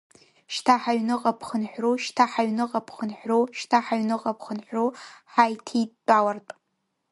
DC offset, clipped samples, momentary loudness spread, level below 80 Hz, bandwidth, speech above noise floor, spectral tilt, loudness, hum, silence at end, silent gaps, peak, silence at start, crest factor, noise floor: under 0.1%; under 0.1%; 10 LU; -74 dBFS; 11.5 kHz; 52 dB; -4.5 dB/octave; -25 LUFS; none; 0.6 s; none; -4 dBFS; 0.5 s; 22 dB; -77 dBFS